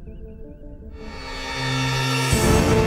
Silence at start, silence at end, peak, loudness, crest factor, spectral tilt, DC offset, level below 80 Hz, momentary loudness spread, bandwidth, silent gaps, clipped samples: 0 s; 0 s; -6 dBFS; -21 LUFS; 16 dB; -4.5 dB/octave; under 0.1%; -32 dBFS; 23 LU; 16 kHz; none; under 0.1%